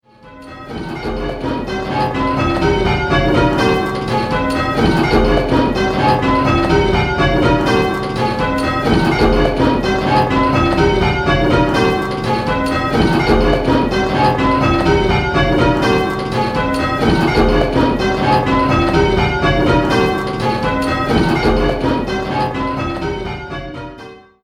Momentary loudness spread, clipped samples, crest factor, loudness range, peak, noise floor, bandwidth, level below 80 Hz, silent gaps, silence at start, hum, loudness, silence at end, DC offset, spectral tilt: 8 LU; under 0.1%; 14 dB; 3 LU; 0 dBFS; -38 dBFS; 14.5 kHz; -26 dBFS; none; 0.25 s; none; -15 LUFS; 0.25 s; under 0.1%; -6.5 dB/octave